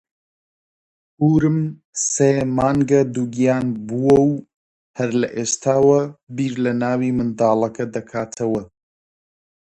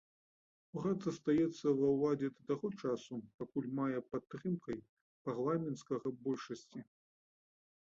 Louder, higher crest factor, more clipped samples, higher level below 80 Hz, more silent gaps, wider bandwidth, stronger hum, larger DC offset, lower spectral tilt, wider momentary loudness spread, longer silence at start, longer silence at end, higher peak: first, -19 LUFS vs -39 LUFS; about the same, 18 dB vs 16 dB; neither; first, -52 dBFS vs -74 dBFS; first, 1.85-1.93 s, 4.56-4.94 s, 6.23-6.27 s vs 3.34-3.38 s, 4.89-5.25 s; first, 10.5 kHz vs 7.6 kHz; neither; neither; second, -6 dB/octave vs -7.5 dB/octave; second, 11 LU vs 14 LU; first, 1.2 s vs 0.75 s; about the same, 1.1 s vs 1.1 s; first, -2 dBFS vs -22 dBFS